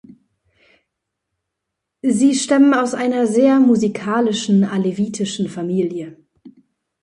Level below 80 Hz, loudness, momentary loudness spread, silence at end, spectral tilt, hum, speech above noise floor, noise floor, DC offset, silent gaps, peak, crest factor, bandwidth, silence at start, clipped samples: -64 dBFS; -17 LUFS; 10 LU; 0.55 s; -5.5 dB/octave; none; 63 dB; -79 dBFS; under 0.1%; none; -2 dBFS; 16 dB; 11 kHz; 2.05 s; under 0.1%